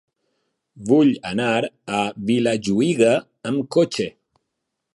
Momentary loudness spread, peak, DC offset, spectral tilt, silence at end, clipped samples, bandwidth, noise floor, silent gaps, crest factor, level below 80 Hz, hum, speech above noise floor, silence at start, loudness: 9 LU; -4 dBFS; under 0.1%; -5.5 dB/octave; 0.85 s; under 0.1%; 11.5 kHz; -79 dBFS; none; 18 dB; -60 dBFS; none; 59 dB; 0.75 s; -20 LUFS